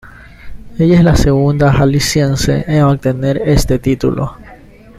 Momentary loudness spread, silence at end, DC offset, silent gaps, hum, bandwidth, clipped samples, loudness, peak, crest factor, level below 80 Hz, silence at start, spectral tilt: 6 LU; 0.45 s; under 0.1%; none; none; 14.5 kHz; under 0.1%; -12 LUFS; 0 dBFS; 12 dB; -24 dBFS; 0.05 s; -6.5 dB/octave